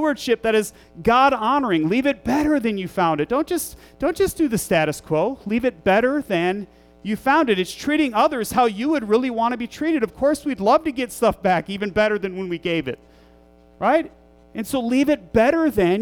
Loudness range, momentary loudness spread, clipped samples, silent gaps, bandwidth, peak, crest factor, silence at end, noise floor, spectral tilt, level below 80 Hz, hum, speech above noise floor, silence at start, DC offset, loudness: 3 LU; 8 LU; under 0.1%; none; 19 kHz; -6 dBFS; 14 dB; 0 s; -51 dBFS; -5 dB/octave; -48 dBFS; none; 31 dB; 0 s; under 0.1%; -20 LUFS